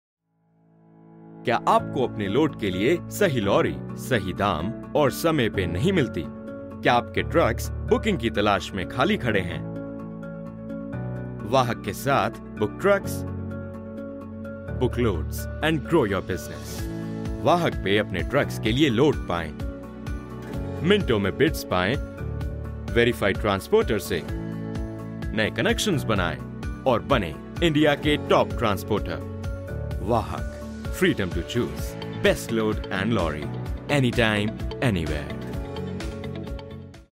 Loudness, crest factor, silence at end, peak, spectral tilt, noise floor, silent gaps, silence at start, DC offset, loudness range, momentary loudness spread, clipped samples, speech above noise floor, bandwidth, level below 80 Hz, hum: -25 LUFS; 20 dB; 0.05 s; -6 dBFS; -6 dB/octave; -64 dBFS; none; 1.1 s; under 0.1%; 3 LU; 13 LU; under 0.1%; 41 dB; 16 kHz; -38 dBFS; none